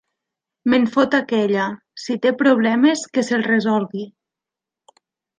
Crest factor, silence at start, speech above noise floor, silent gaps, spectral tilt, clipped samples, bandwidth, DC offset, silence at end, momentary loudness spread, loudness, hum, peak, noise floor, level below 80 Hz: 16 dB; 0.65 s; 69 dB; none; -5 dB/octave; under 0.1%; 9.6 kHz; under 0.1%; 1.3 s; 12 LU; -18 LUFS; none; -4 dBFS; -87 dBFS; -66 dBFS